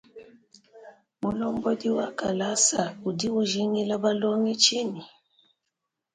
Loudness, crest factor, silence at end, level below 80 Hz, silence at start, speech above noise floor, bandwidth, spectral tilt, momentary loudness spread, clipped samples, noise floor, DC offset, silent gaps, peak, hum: -25 LUFS; 22 dB; 1.05 s; -64 dBFS; 0.15 s; 57 dB; 9.6 kHz; -3 dB/octave; 10 LU; under 0.1%; -83 dBFS; under 0.1%; none; -6 dBFS; none